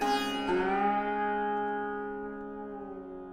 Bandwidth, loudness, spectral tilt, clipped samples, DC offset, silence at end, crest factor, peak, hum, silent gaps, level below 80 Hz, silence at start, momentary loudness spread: 16 kHz; -32 LUFS; -4.5 dB/octave; under 0.1%; under 0.1%; 0 s; 14 dB; -16 dBFS; none; none; -56 dBFS; 0 s; 13 LU